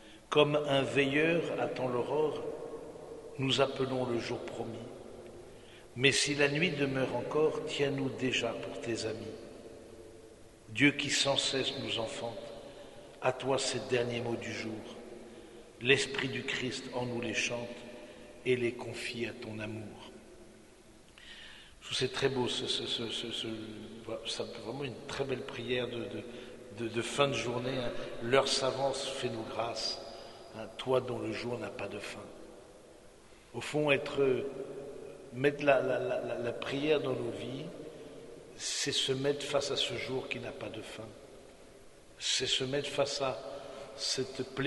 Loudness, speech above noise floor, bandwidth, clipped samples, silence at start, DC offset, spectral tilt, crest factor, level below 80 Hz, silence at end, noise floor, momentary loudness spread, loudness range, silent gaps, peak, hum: -33 LUFS; 24 dB; 11.5 kHz; under 0.1%; 0 s; under 0.1%; -3.5 dB/octave; 26 dB; -62 dBFS; 0 s; -57 dBFS; 21 LU; 6 LU; none; -10 dBFS; none